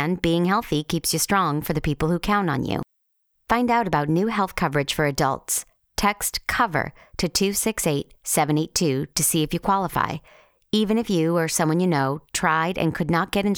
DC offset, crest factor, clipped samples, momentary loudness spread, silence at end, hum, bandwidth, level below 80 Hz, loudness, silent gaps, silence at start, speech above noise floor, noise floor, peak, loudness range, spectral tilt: under 0.1%; 18 dB; under 0.1%; 5 LU; 0 s; none; over 20 kHz; -44 dBFS; -23 LUFS; none; 0 s; 48 dB; -71 dBFS; -4 dBFS; 1 LU; -4 dB/octave